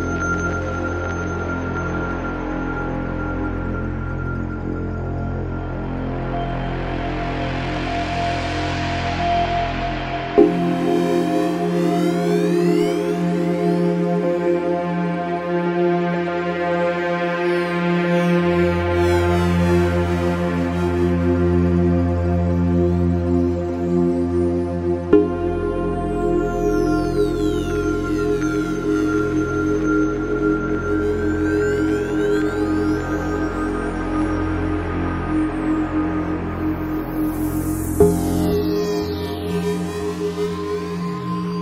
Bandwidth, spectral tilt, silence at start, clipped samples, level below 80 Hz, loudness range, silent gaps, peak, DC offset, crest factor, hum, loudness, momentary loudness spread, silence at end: 16 kHz; -7 dB/octave; 0 s; under 0.1%; -34 dBFS; 6 LU; none; 0 dBFS; under 0.1%; 20 dB; none; -21 LUFS; 7 LU; 0 s